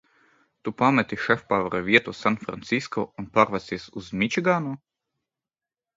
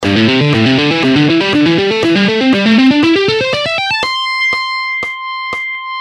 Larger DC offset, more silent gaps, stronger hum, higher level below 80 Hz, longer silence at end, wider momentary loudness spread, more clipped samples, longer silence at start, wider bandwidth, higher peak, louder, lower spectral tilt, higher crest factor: neither; neither; neither; second, -60 dBFS vs -48 dBFS; first, 1.2 s vs 0 s; first, 14 LU vs 9 LU; neither; first, 0.65 s vs 0 s; second, 7.8 kHz vs 11 kHz; about the same, -2 dBFS vs 0 dBFS; second, -24 LUFS vs -11 LUFS; about the same, -5.5 dB/octave vs -5.5 dB/octave; first, 24 dB vs 12 dB